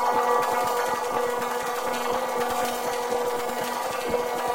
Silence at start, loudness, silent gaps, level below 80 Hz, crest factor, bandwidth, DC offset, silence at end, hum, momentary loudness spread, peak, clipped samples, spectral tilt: 0 s; -26 LUFS; none; -58 dBFS; 16 dB; 17 kHz; under 0.1%; 0 s; none; 5 LU; -10 dBFS; under 0.1%; -2.5 dB/octave